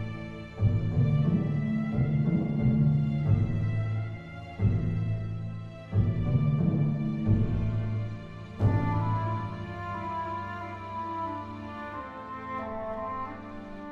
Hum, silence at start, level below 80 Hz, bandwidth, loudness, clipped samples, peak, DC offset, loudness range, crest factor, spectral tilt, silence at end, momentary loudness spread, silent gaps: none; 0 s; -44 dBFS; 4.9 kHz; -30 LUFS; under 0.1%; -12 dBFS; under 0.1%; 9 LU; 16 dB; -10 dB/octave; 0 s; 13 LU; none